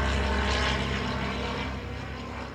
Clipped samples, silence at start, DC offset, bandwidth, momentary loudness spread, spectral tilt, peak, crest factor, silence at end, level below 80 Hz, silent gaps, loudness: under 0.1%; 0 s; under 0.1%; 10.5 kHz; 10 LU; -5 dB/octave; -14 dBFS; 14 dB; 0 s; -34 dBFS; none; -29 LUFS